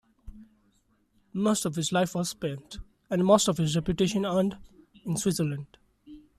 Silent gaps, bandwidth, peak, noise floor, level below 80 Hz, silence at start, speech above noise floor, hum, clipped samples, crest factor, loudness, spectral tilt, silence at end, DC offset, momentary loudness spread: none; 14.5 kHz; -8 dBFS; -68 dBFS; -54 dBFS; 0.25 s; 41 dB; none; under 0.1%; 20 dB; -27 LUFS; -5 dB/octave; 0.2 s; under 0.1%; 19 LU